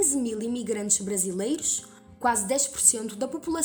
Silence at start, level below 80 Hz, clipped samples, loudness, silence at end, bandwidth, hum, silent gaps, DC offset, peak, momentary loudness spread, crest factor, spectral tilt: 0 s; -60 dBFS; under 0.1%; -25 LUFS; 0 s; over 20 kHz; none; none; under 0.1%; -4 dBFS; 10 LU; 22 dB; -2.5 dB/octave